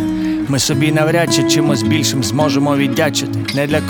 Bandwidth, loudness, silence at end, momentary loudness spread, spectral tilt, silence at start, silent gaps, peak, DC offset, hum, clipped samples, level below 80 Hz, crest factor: over 20 kHz; -15 LUFS; 0 s; 5 LU; -4.5 dB/octave; 0 s; none; 0 dBFS; under 0.1%; none; under 0.1%; -44 dBFS; 14 dB